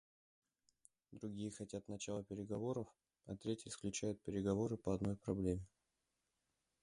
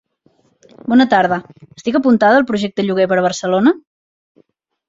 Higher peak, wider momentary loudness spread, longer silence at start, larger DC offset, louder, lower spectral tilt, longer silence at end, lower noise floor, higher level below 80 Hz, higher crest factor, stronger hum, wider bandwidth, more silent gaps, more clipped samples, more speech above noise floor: second, -26 dBFS vs -2 dBFS; about the same, 11 LU vs 11 LU; first, 1.1 s vs 0.85 s; neither; second, -44 LUFS vs -15 LUFS; about the same, -6 dB/octave vs -5.5 dB/octave; about the same, 1.15 s vs 1.1 s; first, -88 dBFS vs -58 dBFS; second, -64 dBFS vs -58 dBFS; first, 20 dB vs 14 dB; neither; first, 11 kHz vs 7.8 kHz; neither; neither; about the same, 45 dB vs 44 dB